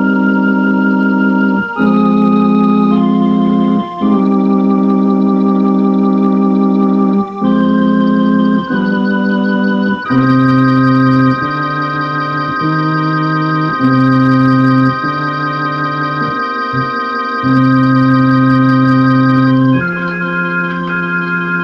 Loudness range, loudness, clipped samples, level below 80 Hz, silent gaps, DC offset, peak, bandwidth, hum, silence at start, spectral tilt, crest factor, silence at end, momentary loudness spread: 2 LU; -12 LUFS; under 0.1%; -48 dBFS; none; under 0.1%; 0 dBFS; 5.8 kHz; none; 0 s; -9 dB/octave; 10 dB; 0 s; 6 LU